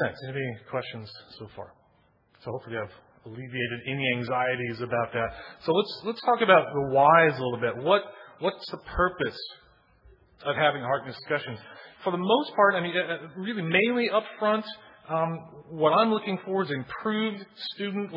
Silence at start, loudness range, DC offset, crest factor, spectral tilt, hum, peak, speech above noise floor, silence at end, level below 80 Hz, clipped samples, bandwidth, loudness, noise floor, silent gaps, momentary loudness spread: 0 s; 9 LU; under 0.1%; 22 dB; -8 dB/octave; none; -6 dBFS; 38 dB; 0 s; -56 dBFS; under 0.1%; 5.8 kHz; -26 LUFS; -64 dBFS; none; 20 LU